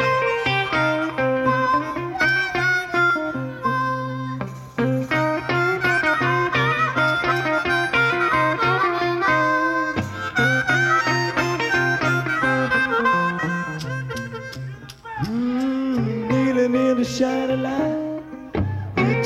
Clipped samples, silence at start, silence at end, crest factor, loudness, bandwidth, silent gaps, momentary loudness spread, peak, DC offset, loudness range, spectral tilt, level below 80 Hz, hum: under 0.1%; 0 s; 0 s; 14 dB; -20 LUFS; 15 kHz; none; 10 LU; -8 dBFS; under 0.1%; 4 LU; -5.5 dB/octave; -50 dBFS; none